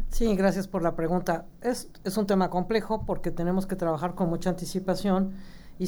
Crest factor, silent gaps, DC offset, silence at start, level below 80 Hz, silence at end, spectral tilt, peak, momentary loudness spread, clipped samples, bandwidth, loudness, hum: 16 dB; none; under 0.1%; 0 s; -38 dBFS; 0 s; -6.5 dB/octave; -12 dBFS; 6 LU; under 0.1%; over 20 kHz; -28 LUFS; none